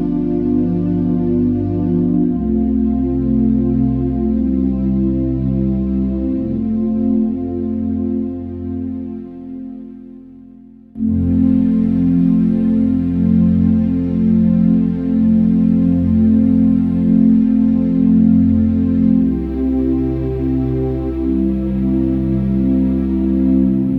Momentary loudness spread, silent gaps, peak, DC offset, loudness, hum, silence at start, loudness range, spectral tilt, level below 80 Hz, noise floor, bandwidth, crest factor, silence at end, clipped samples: 7 LU; none; -2 dBFS; under 0.1%; -15 LUFS; none; 0 s; 7 LU; -12 dB/octave; -30 dBFS; -40 dBFS; 3.5 kHz; 12 dB; 0 s; under 0.1%